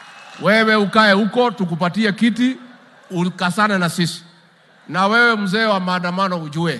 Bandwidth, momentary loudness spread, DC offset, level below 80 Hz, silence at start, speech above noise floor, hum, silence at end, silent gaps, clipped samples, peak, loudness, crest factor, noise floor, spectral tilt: 12.5 kHz; 10 LU; under 0.1%; -66 dBFS; 0 s; 34 dB; none; 0 s; none; under 0.1%; 0 dBFS; -17 LUFS; 18 dB; -51 dBFS; -5.5 dB/octave